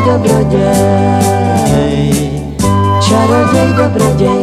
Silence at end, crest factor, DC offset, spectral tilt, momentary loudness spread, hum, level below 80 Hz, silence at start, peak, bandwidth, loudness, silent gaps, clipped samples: 0 s; 10 dB; under 0.1%; -6 dB/octave; 4 LU; none; -28 dBFS; 0 s; 0 dBFS; 15 kHz; -10 LUFS; none; under 0.1%